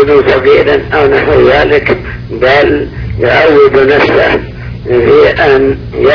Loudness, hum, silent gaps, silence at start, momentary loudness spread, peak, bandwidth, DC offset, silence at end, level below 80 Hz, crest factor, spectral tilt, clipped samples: -7 LUFS; none; none; 0 s; 9 LU; 0 dBFS; 5.4 kHz; under 0.1%; 0 s; -26 dBFS; 8 dB; -7.5 dB/octave; 3%